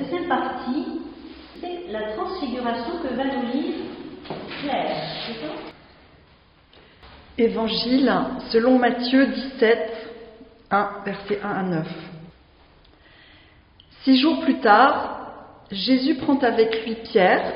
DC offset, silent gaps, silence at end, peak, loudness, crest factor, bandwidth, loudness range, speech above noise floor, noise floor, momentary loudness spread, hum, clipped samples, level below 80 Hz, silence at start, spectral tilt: under 0.1%; none; 0 s; -2 dBFS; -22 LUFS; 22 dB; 5.4 kHz; 9 LU; 34 dB; -54 dBFS; 18 LU; none; under 0.1%; -54 dBFS; 0 s; -3 dB/octave